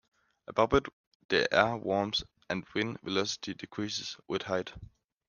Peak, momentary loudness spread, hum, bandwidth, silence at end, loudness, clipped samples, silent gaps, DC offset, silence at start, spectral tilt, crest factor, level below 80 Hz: -6 dBFS; 11 LU; none; 9.8 kHz; 0.45 s; -31 LUFS; under 0.1%; 0.93-1.29 s; under 0.1%; 0.5 s; -4 dB/octave; 26 dB; -56 dBFS